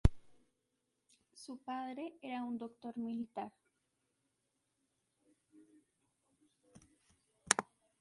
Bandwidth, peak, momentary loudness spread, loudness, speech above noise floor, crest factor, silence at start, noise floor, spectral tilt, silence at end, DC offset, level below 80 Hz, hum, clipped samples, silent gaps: 11.5 kHz; -8 dBFS; 16 LU; -41 LUFS; 41 dB; 36 dB; 0.05 s; -85 dBFS; -4 dB/octave; 0.35 s; under 0.1%; -48 dBFS; none; under 0.1%; none